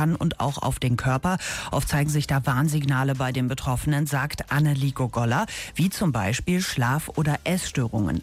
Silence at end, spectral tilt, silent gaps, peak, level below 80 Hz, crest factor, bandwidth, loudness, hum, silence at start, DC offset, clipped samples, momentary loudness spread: 0 s; -5.5 dB/octave; none; -14 dBFS; -42 dBFS; 10 dB; 16 kHz; -24 LUFS; none; 0 s; under 0.1%; under 0.1%; 3 LU